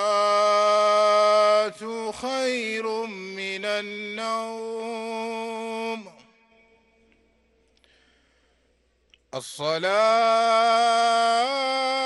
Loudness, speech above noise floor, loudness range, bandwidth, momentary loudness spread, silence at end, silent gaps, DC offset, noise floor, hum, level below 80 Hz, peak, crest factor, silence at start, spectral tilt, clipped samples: -23 LUFS; 43 dB; 16 LU; 12 kHz; 13 LU; 0 s; none; under 0.1%; -66 dBFS; none; -70 dBFS; -8 dBFS; 16 dB; 0 s; -2.5 dB/octave; under 0.1%